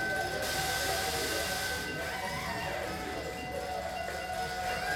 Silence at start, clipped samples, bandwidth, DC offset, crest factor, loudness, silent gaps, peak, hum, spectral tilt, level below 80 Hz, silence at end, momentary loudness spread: 0 s; under 0.1%; 17.5 kHz; under 0.1%; 16 dB; -34 LUFS; none; -18 dBFS; none; -2.5 dB/octave; -50 dBFS; 0 s; 6 LU